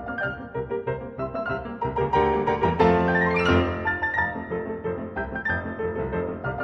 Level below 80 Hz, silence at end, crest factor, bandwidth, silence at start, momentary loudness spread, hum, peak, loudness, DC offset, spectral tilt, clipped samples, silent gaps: -42 dBFS; 0 s; 20 dB; 6.8 kHz; 0 s; 10 LU; none; -6 dBFS; -25 LUFS; under 0.1%; -7.5 dB/octave; under 0.1%; none